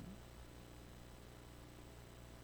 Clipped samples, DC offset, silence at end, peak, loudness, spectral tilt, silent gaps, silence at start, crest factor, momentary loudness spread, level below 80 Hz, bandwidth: under 0.1%; under 0.1%; 0 s; -42 dBFS; -58 LUFS; -5 dB/octave; none; 0 s; 14 dB; 1 LU; -62 dBFS; over 20 kHz